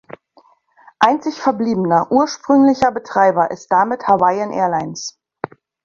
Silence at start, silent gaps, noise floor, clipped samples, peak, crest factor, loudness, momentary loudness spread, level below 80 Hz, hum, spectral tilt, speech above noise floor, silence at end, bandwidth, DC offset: 1 s; none; -53 dBFS; under 0.1%; 0 dBFS; 16 dB; -16 LUFS; 16 LU; -56 dBFS; none; -5.5 dB/octave; 38 dB; 0.4 s; 7.4 kHz; under 0.1%